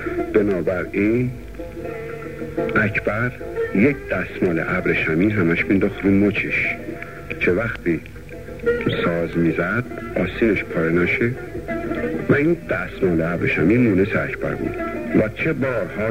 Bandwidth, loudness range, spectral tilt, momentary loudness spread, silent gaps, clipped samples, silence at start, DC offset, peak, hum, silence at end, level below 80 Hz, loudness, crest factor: 16 kHz; 3 LU; -8 dB/octave; 11 LU; none; under 0.1%; 0 s; 0.6%; -4 dBFS; none; 0 s; -42 dBFS; -20 LUFS; 18 dB